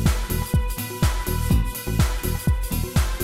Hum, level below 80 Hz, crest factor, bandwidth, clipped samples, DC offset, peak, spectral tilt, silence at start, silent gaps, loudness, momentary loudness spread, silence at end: none; -24 dBFS; 16 dB; 16.5 kHz; under 0.1%; under 0.1%; -6 dBFS; -5 dB/octave; 0 s; none; -24 LUFS; 3 LU; 0 s